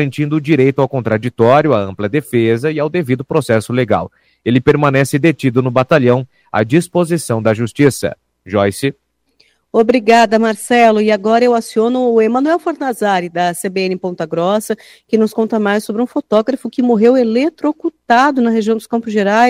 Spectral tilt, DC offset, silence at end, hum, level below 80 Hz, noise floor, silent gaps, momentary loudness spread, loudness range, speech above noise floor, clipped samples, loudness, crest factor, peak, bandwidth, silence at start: -6 dB/octave; under 0.1%; 0 s; none; -52 dBFS; -56 dBFS; none; 8 LU; 4 LU; 43 dB; 0.1%; -14 LUFS; 14 dB; 0 dBFS; 16.5 kHz; 0 s